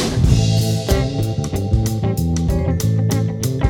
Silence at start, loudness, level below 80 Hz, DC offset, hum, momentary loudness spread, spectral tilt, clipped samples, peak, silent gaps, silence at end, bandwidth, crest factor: 0 s; -18 LUFS; -26 dBFS; under 0.1%; none; 5 LU; -6 dB/octave; under 0.1%; -2 dBFS; none; 0 s; 17.5 kHz; 14 dB